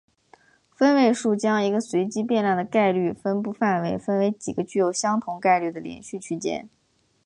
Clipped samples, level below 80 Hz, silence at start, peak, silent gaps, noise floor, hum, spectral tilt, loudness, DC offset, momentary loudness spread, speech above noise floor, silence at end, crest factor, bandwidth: under 0.1%; -64 dBFS; 0.8 s; -8 dBFS; none; -57 dBFS; none; -5.5 dB/octave; -23 LUFS; under 0.1%; 10 LU; 34 dB; 0.6 s; 16 dB; 11 kHz